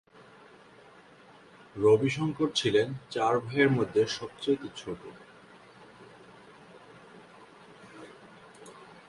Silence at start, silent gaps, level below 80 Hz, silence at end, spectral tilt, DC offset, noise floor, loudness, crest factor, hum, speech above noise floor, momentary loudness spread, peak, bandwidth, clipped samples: 1.75 s; none; -66 dBFS; 0.25 s; -5.5 dB/octave; under 0.1%; -55 dBFS; -28 LUFS; 22 dB; none; 28 dB; 26 LU; -10 dBFS; 11.5 kHz; under 0.1%